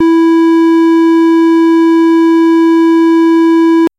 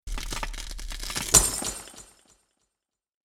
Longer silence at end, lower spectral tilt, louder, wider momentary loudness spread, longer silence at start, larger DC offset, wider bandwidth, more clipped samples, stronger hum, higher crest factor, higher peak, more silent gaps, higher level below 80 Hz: second, 0.1 s vs 1.2 s; first, -4.5 dB/octave vs -1 dB/octave; first, -7 LUFS vs -24 LUFS; second, 0 LU vs 20 LU; about the same, 0 s vs 0.05 s; neither; second, 7.4 kHz vs 17.5 kHz; neither; neither; second, 2 dB vs 30 dB; second, -4 dBFS vs 0 dBFS; neither; second, -58 dBFS vs -38 dBFS